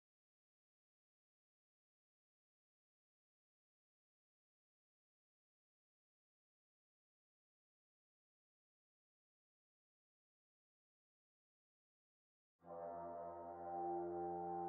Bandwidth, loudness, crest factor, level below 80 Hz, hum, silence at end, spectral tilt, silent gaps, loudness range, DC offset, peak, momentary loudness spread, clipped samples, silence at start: 2.3 kHz; -48 LUFS; 20 dB; -90 dBFS; none; 0 s; -4.5 dB/octave; none; 11 LU; under 0.1%; -36 dBFS; 9 LU; under 0.1%; 12.65 s